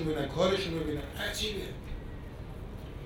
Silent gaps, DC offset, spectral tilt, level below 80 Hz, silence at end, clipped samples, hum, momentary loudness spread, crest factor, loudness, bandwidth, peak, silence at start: none; under 0.1%; -5 dB/octave; -44 dBFS; 0 s; under 0.1%; none; 15 LU; 18 dB; -34 LUFS; over 20 kHz; -16 dBFS; 0 s